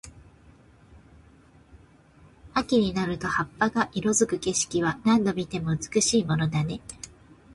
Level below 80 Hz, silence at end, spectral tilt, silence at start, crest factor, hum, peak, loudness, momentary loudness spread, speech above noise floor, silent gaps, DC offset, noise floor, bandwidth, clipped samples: -52 dBFS; 0 s; -4.5 dB/octave; 0.05 s; 18 dB; none; -10 dBFS; -25 LUFS; 8 LU; 30 dB; none; under 0.1%; -55 dBFS; 11.5 kHz; under 0.1%